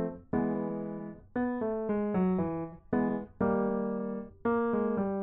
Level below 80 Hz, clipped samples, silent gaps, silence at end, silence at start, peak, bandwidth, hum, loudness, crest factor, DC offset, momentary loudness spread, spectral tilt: -58 dBFS; under 0.1%; none; 0 s; 0 s; -18 dBFS; 3.8 kHz; none; -32 LUFS; 14 dB; under 0.1%; 8 LU; -12.5 dB/octave